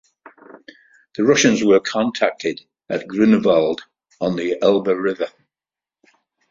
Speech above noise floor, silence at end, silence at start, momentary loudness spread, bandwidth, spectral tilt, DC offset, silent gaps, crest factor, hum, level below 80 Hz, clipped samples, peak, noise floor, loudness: over 73 dB; 1.2 s; 1.2 s; 13 LU; 7.6 kHz; -4.5 dB/octave; under 0.1%; none; 18 dB; none; -60 dBFS; under 0.1%; -2 dBFS; under -90 dBFS; -18 LUFS